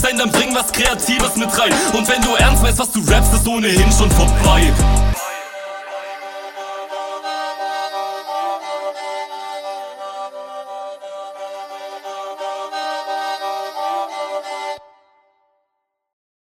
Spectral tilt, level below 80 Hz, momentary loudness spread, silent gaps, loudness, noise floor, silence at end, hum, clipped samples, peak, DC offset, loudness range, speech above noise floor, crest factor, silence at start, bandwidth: -3.5 dB/octave; -22 dBFS; 17 LU; none; -17 LUFS; -74 dBFS; 1.8 s; none; under 0.1%; 0 dBFS; under 0.1%; 14 LU; 61 dB; 18 dB; 0 s; 17.5 kHz